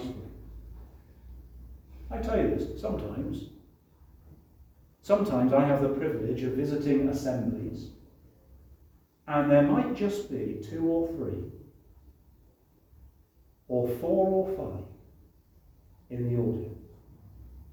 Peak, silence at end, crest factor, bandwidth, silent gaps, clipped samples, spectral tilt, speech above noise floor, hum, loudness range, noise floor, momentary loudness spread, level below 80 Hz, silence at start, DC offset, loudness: -10 dBFS; 0 s; 22 dB; over 20 kHz; none; under 0.1%; -8.5 dB/octave; 34 dB; none; 7 LU; -62 dBFS; 25 LU; -48 dBFS; 0 s; under 0.1%; -29 LUFS